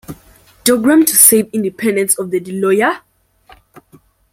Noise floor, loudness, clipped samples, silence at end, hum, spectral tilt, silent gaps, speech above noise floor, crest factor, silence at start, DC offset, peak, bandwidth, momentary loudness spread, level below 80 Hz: -49 dBFS; -12 LUFS; 0.2%; 1.35 s; none; -3 dB/octave; none; 36 dB; 16 dB; 0.1 s; under 0.1%; 0 dBFS; 17 kHz; 12 LU; -54 dBFS